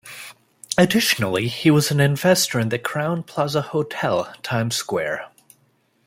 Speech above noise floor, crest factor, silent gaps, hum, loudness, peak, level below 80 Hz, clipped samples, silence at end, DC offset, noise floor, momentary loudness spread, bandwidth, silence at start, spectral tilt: 43 dB; 22 dB; none; none; -20 LUFS; 0 dBFS; -58 dBFS; under 0.1%; 0.8 s; under 0.1%; -63 dBFS; 10 LU; 16.5 kHz; 0.05 s; -4.5 dB/octave